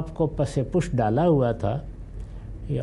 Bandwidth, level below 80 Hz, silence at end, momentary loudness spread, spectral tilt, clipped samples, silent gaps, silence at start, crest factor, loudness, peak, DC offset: 11.5 kHz; -38 dBFS; 0 s; 19 LU; -8 dB/octave; under 0.1%; none; 0 s; 14 dB; -24 LUFS; -10 dBFS; under 0.1%